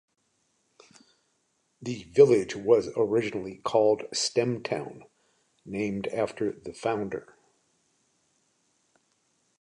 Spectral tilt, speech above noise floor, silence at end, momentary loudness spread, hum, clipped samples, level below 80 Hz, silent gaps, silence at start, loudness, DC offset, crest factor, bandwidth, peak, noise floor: -5 dB/octave; 47 dB; 2.4 s; 16 LU; none; under 0.1%; -66 dBFS; none; 1.8 s; -27 LUFS; under 0.1%; 24 dB; 10.5 kHz; -6 dBFS; -73 dBFS